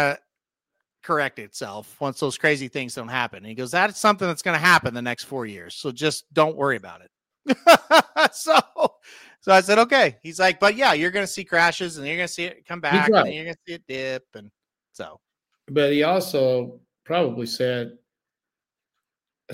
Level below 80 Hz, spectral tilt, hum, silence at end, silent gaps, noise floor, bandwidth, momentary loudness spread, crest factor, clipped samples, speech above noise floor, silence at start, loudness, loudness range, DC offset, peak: -64 dBFS; -4 dB/octave; none; 0 s; none; -89 dBFS; 16.5 kHz; 17 LU; 22 dB; under 0.1%; 67 dB; 0 s; -21 LUFS; 7 LU; under 0.1%; 0 dBFS